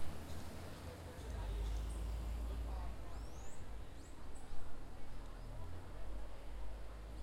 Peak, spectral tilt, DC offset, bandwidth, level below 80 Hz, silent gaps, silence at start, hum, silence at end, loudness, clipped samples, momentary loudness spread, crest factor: -26 dBFS; -5.5 dB/octave; under 0.1%; 15.5 kHz; -48 dBFS; none; 0 s; none; 0 s; -50 LUFS; under 0.1%; 10 LU; 14 dB